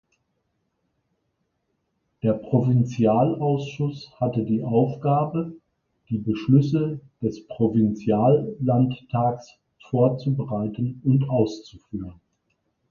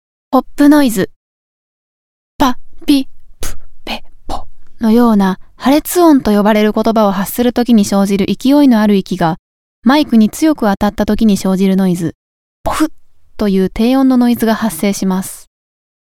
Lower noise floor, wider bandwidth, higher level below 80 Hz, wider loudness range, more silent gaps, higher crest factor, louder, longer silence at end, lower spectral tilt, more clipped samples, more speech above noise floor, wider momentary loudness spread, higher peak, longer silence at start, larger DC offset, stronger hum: second, -74 dBFS vs under -90 dBFS; second, 7 kHz vs 18 kHz; second, -56 dBFS vs -34 dBFS; about the same, 3 LU vs 5 LU; second, none vs 1.16-2.39 s, 9.39-9.82 s, 12.15-12.64 s; first, 18 dB vs 12 dB; second, -23 LUFS vs -12 LUFS; first, 0.8 s vs 0.65 s; first, -9.5 dB/octave vs -6 dB/octave; neither; second, 52 dB vs over 79 dB; second, 10 LU vs 16 LU; second, -6 dBFS vs 0 dBFS; first, 2.25 s vs 0.3 s; second, under 0.1% vs 0.6%; neither